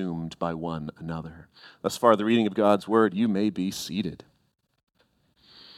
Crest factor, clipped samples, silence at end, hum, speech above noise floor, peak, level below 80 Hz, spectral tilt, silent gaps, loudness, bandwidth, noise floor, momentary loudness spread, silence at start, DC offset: 22 dB; under 0.1%; 0.05 s; none; 42 dB; -4 dBFS; -60 dBFS; -6 dB/octave; 4.83-4.87 s; -26 LUFS; 15.5 kHz; -68 dBFS; 14 LU; 0 s; under 0.1%